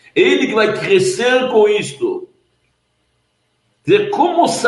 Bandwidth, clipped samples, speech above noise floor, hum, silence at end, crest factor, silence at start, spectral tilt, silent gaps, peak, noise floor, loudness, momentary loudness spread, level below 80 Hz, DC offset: 11.5 kHz; under 0.1%; 51 dB; none; 0 s; 14 dB; 0.15 s; -4 dB/octave; none; 0 dBFS; -64 dBFS; -14 LUFS; 9 LU; -62 dBFS; under 0.1%